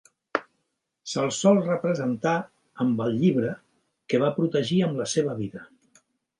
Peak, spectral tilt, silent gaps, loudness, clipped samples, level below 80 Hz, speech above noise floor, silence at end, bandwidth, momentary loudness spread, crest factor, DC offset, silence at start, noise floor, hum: -6 dBFS; -5.5 dB/octave; none; -25 LUFS; under 0.1%; -68 dBFS; 53 dB; 0.75 s; 11.5 kHz; 12 LU; 20 dB; under 0.1%; 0.35 s; -77 dBFS; none